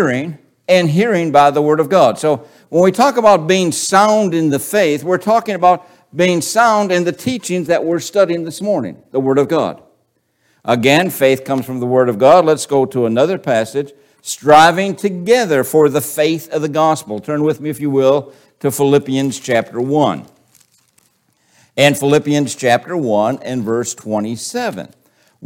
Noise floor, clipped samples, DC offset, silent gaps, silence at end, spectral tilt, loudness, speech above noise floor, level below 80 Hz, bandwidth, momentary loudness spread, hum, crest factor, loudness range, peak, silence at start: -63 dBFS; under 0.1%; under 0.1%; none; 0 s; -5 dB/octave; -14 LUFS; 49 dB; -60 dBFS; 17 kHz; 10 LU; none; 14 dB; 5 LU; 0 dBFS; 0 s